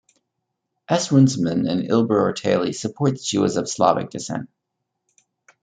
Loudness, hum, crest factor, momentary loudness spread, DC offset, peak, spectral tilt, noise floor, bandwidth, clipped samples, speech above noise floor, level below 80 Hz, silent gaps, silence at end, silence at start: -20 LUFS; none; 20 dB; 10 LU; under 0.1%; -2 dBFS; -5.5 dB/octave; -79 dBFS; 9.4 kHz; under 0.1%; 59 dB; -64 dBFS; none; 1.15 s; 0.9 s